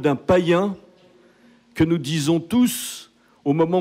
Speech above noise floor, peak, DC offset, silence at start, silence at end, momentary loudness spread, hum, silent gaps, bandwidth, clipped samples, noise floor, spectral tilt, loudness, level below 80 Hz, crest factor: 34 dB; -6 dBFS; under 0.1%; 0 s; 0 s; 15 LU; none; none; 16 kHz; under 0.1%; -54 dBFS; -5.5 dB/octave; -21 LUFS; -54 dBFS; 14 dB